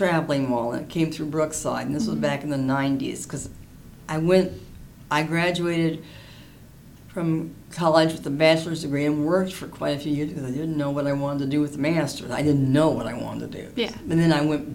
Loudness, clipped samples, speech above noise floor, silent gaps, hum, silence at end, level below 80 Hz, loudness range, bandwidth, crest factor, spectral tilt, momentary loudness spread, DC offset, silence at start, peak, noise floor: -24 LUFS; under 0.1%; 23 dB; none; none; 0 s; -50 dBFS; 3 LU; 17 kHz; 20 dB; -6 dB/octave; 12 LU; under 0.1%; 0 s; -4 dBFS; -47 dBFS